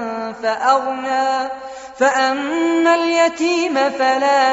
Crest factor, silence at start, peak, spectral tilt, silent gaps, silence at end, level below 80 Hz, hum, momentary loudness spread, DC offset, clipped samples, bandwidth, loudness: 14 dB; 0 s; -2 dBFS; 0 dB/octave; none; 0 s; -60 dBFS; none; 8 LU; under 0.1%; under 0.1%; 8 kHz; -17 LUFS